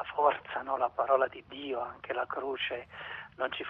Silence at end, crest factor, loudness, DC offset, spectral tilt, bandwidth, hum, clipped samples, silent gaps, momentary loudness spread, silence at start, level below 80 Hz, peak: 0 s; 20 dB; -33 LUFS; under 0.1%; -6.5 dB/octave; 5.4 kHz; none; under 0.1%; none; 13 LU; 0 s; -68 dBFS; -12 dBFS